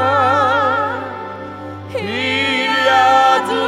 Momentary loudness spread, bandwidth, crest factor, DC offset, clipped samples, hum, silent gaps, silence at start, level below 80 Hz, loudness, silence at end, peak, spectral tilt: 17 LU; 15.5 kHz; 14 dB; under 0.1%; under 0.1%; 50 Hz at -50 dBFS; none; 0 s; -60 dBFS; -14 LUFS; 0 s; -2 dBFS; -4 dB/octave